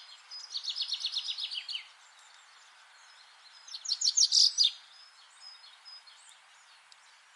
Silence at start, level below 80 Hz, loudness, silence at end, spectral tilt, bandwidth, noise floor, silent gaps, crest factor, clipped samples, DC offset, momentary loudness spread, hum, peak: 0 s; under -90 dBFS; -27 LUFS; 1.35 s; 8.5 dB/octave; 11.5 kHz; -59 dBFS; none; 24 dB; under 0.1%; under 0.1%; 28 LU; none; -10 dBFS